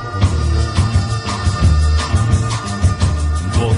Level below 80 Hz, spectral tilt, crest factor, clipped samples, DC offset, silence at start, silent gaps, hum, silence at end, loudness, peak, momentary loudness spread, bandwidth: -20 dBFS; -5.5 dB/octave; 14 dB; under 0.1%; under 0.1%; 0 s; none; none; 0 s; -16 LUFS; -2 dBFS; 4 LU; 11 kHz